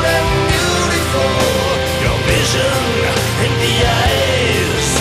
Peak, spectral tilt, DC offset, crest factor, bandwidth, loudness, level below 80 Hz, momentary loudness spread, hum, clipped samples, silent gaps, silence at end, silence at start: 0 dBFS; -4 dB/octave; under 0.1%; 14 dB; 15.5 kHz; -14 LUFS; -26 dBFS; 2 LU; none; under 0.1%; none; 0 s; 0 s